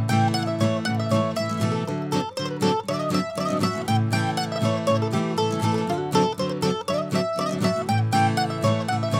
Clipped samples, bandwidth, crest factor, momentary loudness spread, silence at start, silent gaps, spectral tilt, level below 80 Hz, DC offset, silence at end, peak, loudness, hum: under 0.1%; 16 kHz; 18 dB; 4 LU; 0 s; none; -6 dB/octave; -64 dBFS; under 0.1%; 0 s; -6 dBFS; -24 LUFS; none